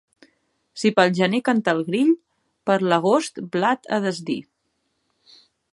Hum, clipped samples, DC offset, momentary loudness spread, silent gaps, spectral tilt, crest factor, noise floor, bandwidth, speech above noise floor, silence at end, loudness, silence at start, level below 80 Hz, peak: none; under 0.1%; under 0.1%; 10 LU; none; -5.5 dB/octave; 20 dB; -72 dBFS; 11.5 kHz; 52 dB; 1.3 s; -21 LUFS; 0.75 s; -70 dBFS; -2 dBFS